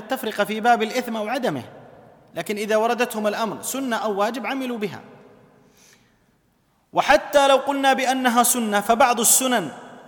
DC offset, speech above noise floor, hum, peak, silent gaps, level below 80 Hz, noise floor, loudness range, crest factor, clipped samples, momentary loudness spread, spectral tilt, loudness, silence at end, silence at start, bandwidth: under 0.1%; 43 dB; none; -4 dBFS; none; -58 dBFS; -64 dBFS; 10 LU; 20 dB; under 0.1%; 12 LU; -2.5 dB/octave; -20 LUFS; 0 s; 0 s; 19 kHz